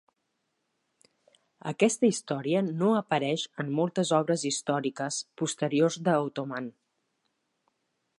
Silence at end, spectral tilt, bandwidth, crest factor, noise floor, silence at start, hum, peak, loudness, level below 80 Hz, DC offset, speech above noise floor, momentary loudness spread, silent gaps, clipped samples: 1.5 s; -5 dB/octave; 11.5 kHz; 20 dB; -79 dBFS; 1.65 s; none; -10 dBFS; -28 LUFS; -80 dBFS; under 0.1%; 51 dB; 9 LU; none; under 0.1%